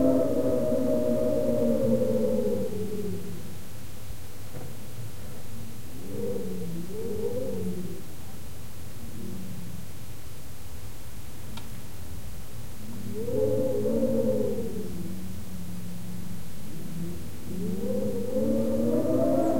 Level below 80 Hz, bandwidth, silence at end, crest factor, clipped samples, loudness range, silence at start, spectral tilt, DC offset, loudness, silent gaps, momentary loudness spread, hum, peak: -50 dBFS; 16.5 kHz; 0 s; 18 dB; under 0.1%; 14 LU; 0 s; -7 dB/octave; 3%; -30 LUFS; none; 17 LU; none; -10 dBFS